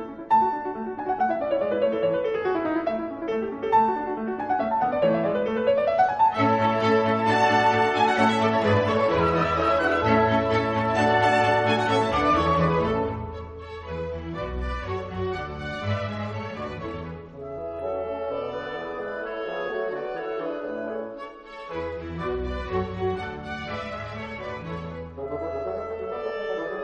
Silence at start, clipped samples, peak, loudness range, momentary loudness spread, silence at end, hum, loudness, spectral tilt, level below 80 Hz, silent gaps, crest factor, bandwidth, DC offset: 0 s; under 0.1%; -8 dBFS; 11 LU; 13 LU; 0 s; none; -25 LUFS; -6.5 dB/octave; -44 dBFS; none; 18 dB; 10.5 kHz; under 0.1%